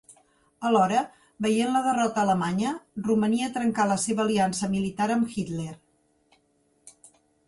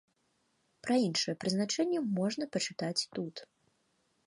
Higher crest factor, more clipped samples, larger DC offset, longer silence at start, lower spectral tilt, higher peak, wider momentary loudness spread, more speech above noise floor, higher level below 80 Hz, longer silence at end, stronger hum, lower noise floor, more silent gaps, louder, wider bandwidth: about the same, 18 dB vs 18 dB; neither; neither; second, 0.1 s vs 0.85 s; about the same, -5 dB/octave vs -4 dB/octave; first, -8 dBFS vs -18 dBFS; second, 8 LU vs 11 LU; about the same, 43 dB vs 43 dB; first, -62 dBFS vs -78 dBFS; second, 0.55 s vs 0.8 s; neither; second, -68 dBFS vs -76 dBFS; neither; first, -25 LUFS vs -33 LUFS; about the same, 11.5 kHz vs 11.5 kHz